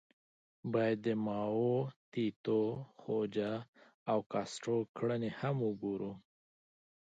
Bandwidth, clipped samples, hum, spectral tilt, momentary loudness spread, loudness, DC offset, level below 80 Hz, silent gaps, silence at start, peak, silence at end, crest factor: 9 kHz; under 0.1%; none; -7 dB/octave; 9 LU; -37 LUFS; under 0.1%; -76 dBFS; 1.96-2.12 s, 2.36-2.44 s, 3.68-3.73 s, 3.94-4.06 s, 4.26-4.30 s, 4.89-4.94 s; 0.65 s; -20 dBFS; 0.8 s; 16 dB